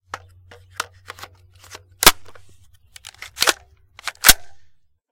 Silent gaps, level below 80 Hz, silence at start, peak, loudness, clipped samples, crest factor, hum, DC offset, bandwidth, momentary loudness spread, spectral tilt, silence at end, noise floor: none; -40 dBFS; 0.15 s; 0 dBFS; -15 LUFS; 0.1%; 22 dB; none; under 0.1%; 17 kHz; 25 LU; 0 dB/octave; 0.55 s; -51 dBFS